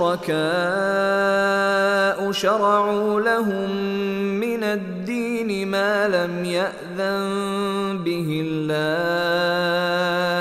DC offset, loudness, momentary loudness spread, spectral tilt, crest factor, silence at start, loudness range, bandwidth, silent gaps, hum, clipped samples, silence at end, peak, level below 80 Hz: under 0.1%; -21 LUFS; 5 LU; -5 dB/octave; 16 dB; 0 s; 4 LU; 15.5 kHz; none; none; under 0.1%; 0 s; -6 dBFS; -60 dBFS